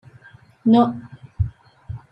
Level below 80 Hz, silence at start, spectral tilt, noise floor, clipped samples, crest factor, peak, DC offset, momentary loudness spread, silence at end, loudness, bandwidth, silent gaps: -40 dBFS; 0.65 s; -9.5 dB/octave; -48 dBFS; under 0.1%; 18 dB; -4 dBFS; under 0.1%; 21 LU; 0.15 s; -20 LUFS; 5.4 kHz; none